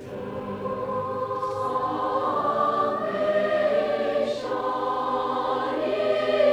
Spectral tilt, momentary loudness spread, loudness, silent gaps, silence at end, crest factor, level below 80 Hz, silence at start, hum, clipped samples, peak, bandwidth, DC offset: -6 dB/octave; 6 LU; -25 LUFS; none; 0 s; 16 dB; -60 dBFS; 0 s; none; under 0.1%; -10 dBFS; 10.5 kHz; under 0.1%